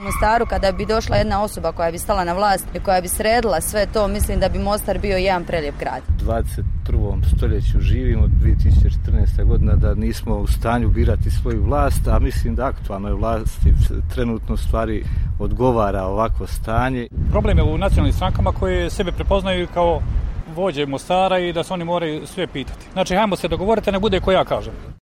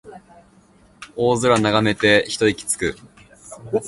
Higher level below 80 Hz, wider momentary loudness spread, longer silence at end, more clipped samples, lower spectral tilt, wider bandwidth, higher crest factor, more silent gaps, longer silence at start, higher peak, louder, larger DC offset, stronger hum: first, -22 dBFS vs -50 dBFS; second, 7 LU vs 10 LU; about the same, 0.05 s vs 0 s; neither; first, -6 dB/octave vs -4 dB/octave; first, 16 kHz vs 12 kHz; second, 12 dB vs 20 dB; neither; about the same, 0 s vs 0.05 s; second, -6 dBFS vs 0 dBFS; about the same, -20 LUFS vs -18 LUFS; neither; neither